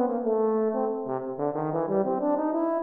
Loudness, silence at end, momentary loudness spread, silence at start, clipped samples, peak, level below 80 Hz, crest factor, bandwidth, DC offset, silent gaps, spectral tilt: -27 LUFS; 0 s; 5 LU; 0 s; under 0.1%; -12 dBFS; -72 dBFS; 14 dB; 2.8 kHz; under 0.1%; none; -12.5 dB/octave